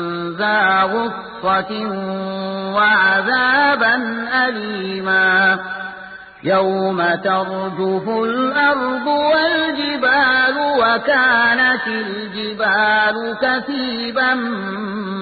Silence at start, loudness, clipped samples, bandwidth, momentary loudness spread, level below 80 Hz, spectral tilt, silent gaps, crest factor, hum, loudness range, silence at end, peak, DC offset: 0 s; -16 LUFS; under 0.1%; 4.8 kHz; 11 LU; -56 dBFS; -9.5 dB/octave; none; 14 dB; none; 3 LU; 0 s; -4 dBFS; under 0.1%